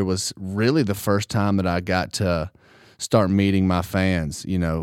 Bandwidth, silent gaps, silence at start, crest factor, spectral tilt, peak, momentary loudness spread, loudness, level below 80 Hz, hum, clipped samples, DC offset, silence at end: 16.5 kHz; none; 0 s; 18 dB; -5.5 dB/octave; -4 dBFS; 7 LU; -22 LUFS; -44 dBFS; none; under 0.1%; under 0.1%; 0 s